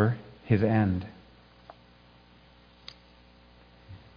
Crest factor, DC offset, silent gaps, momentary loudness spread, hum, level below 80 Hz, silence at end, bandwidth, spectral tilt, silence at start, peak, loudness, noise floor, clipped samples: 22 dB; under 0.1%; none; 25 LU; 60 Hz at -60 dBFS; -58 dBFS; 0.2 s; 5.2 kHz; -10 dB/octave; 0 s; -10 dBFS; -27 LUFS; -57 dBFS; under 0.1%